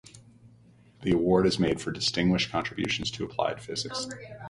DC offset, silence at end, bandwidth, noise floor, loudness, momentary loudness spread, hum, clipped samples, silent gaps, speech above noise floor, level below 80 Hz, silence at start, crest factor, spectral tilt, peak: under 0.1%; 0 s; 11.5 kHz; -57 dBFS; -28 LUFS; 10 LU; none; under 0.1%; none; 29 dB; -52 dBFS; 0.15 s; 20 dB; -5 dB/octave; -10 dBFS